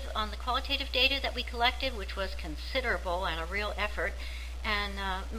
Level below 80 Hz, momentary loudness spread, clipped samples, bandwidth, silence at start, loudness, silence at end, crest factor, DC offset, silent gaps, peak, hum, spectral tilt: -38 dBFS; 10 LU; under 0.1%; 16 kHz; 0 s; -31 LUFS; 0 s; 22 dB; 0.4%; none; -10 dBFS; none; -4 dB/octave